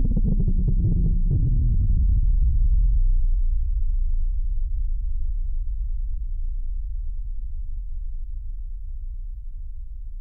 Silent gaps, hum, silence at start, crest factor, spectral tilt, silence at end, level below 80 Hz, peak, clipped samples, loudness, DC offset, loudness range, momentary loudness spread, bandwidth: none; none; 0 s; 8 dB; -14.5 dB/octave; 0 s; -22 dBFS; -12 dBFS; under 0.1%; -27 LUFS; under 0.1%; 12 LU; 15 LU; 0.6 kHz